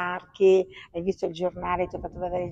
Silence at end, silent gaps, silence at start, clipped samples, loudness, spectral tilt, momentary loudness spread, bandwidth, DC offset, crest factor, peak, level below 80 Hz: 0 s; none; 0 s; under 0.1%; -26 LUFS; -7 dB/octave; 11 LU; 7.6 kHz; under 0.1%; 16 dB; -10 dBFS; -50 dBFS